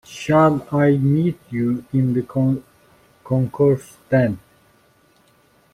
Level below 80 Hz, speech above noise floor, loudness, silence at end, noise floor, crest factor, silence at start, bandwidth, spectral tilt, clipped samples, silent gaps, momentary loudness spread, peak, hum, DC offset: -54 dBFS; 39 dB; -19 LUFS; 1.35 s; -57 dBFS; 16 dB; 0.1 s; 13.5 kHz; -8.5 dB/octave; under 0.1%; none; 8 LU; -4 dBFS; none; under 0.1%